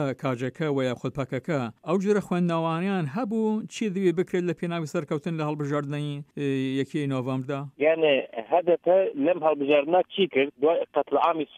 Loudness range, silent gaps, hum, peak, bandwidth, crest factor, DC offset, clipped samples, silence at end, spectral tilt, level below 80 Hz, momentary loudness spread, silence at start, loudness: 5 LU; none; none; -8 dBFS; 14 kHz; 16 dB; under 0.1%; under 0.1%; 0 s; -7 dB/octave; -68 dBFS; 8 LU; 0 s; -26 LUFS